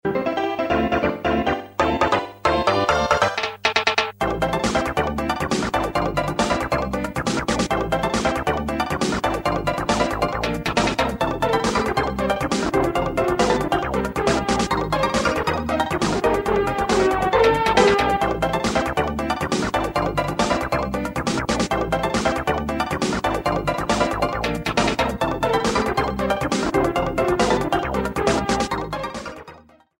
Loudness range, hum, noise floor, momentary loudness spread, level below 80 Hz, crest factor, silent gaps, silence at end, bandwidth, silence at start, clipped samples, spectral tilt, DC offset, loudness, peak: 3 LU; none; -46 dBFS; 5 LU; -36 dBFS; 18 dB; none; 0.4 s; 16.5 kHz; 0.05 s; under 0.1%; -4.5 dB/octave; under 0.1%; -21 LUFS; -2 dBFS